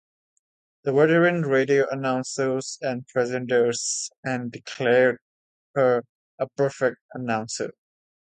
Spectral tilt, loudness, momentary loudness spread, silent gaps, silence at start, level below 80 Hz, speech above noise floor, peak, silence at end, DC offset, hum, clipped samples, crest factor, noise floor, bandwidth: -4.5 dB/octave; -24 LUFS; 12 LU; 4.18-4.23 s, 5.21-5.74 s, 6.09-6.38 s, 7.01-7.09 s; 0.85 s; -70 dBFS; over 67 dB; -6 dBFS; 0.55 s; under 0.1%; none; under 0.1%; 18 dB; under -90 dBFS; 9.4 kHz